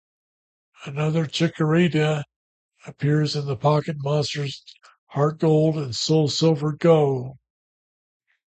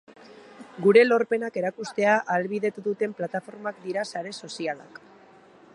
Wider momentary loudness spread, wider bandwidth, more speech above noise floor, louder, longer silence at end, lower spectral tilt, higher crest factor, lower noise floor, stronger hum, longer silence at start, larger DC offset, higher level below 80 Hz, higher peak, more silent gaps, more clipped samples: second, 12 LU vs 16 LU; second, 8.8 kHz vs 11 kHz; first, over 69 dB vs 28 dB; first, -22 LUFS vs -25 LUFS; first, 1.2 s vs 0.95 s; about the same, -6 dB/octave vs -5.5 dB/octave; about the same, 18 dB vs 22 dB; first, under -90 dBFS vs -53 dBFS; neither; first, 0.8 s vs 0.3 s; neither; first, -62 dBFS vs -78 dBFS; about the same, -6 dBFS vs -4 dBFS; first, 2.36-2.69 s, 4.98-5.07 s vs none; neither